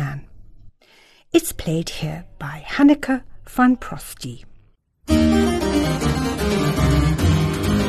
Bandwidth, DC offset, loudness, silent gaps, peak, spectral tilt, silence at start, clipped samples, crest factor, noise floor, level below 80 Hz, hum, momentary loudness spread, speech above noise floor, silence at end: 13 kHz; under 0.1%; -19 LUFS; none; -2 dBFS; -6 dB/octave; 0 s; under 0.1%; 18 dB; -54 dBFS; -32 dBFS; none; 16 LU; 34 dB; 0 s